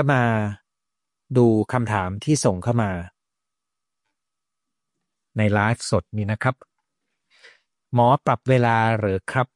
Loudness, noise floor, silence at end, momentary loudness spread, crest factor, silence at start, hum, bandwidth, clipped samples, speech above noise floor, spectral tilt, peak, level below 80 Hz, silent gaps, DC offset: -21 LUFS; -86 dBFS; 0.1 s; 10 LU; 18 dB; 0 s; none; 11.5 kHz; under 0.1%; 66 dB; -6.5 dB/octave; -4 dBFS; -58 dBFS; none; under 0.1%